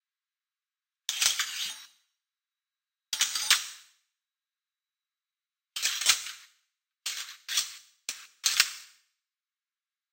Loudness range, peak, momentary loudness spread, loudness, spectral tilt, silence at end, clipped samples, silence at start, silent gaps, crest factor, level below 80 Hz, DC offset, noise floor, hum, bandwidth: 3 LU; -2 dBFS; 16 LU; -28 LUFS; 4.5 dB/octave; 1.25 s; under 0.1%; 1.1 s; none; 34 dB; -78 dBFS; under 0.1%; under -90 dBFS; none; 16.5 kHz